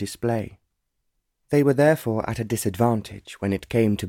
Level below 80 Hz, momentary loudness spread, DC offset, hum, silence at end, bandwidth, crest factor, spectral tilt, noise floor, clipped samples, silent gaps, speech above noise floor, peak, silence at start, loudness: -52 dBFS; 10 LU; under 0.1%; none; 0 s; 17.5 kHz; 16 dB; -6.5 dB/octave; -76 dBFS; under 0.1%; none; 53 dB; -8 dBFS; 0 s; -23 LUFS